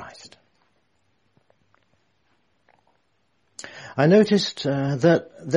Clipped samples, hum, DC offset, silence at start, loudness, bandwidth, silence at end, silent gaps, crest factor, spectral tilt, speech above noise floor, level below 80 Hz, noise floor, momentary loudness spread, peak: under 0.1%; none; under 0.1%; 0 s; -20 LUFS; 10.5 kHz; 0 s; none; 22 dB; -6.5 dB/octave; 50 dB; -66 dBFS; -70 dBFS; 24 LU; -4 dBFS